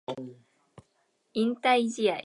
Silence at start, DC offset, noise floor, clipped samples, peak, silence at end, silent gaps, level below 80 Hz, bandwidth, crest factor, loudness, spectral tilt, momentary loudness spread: 0.1 s; under 0.1%; -73 dBFS; under 0.1%; -12 dBFS; 0 s; none; -76 dBFS; 11.5 kHz; 16 dB; -27 LUFS; -4 dB/octave; 16 LU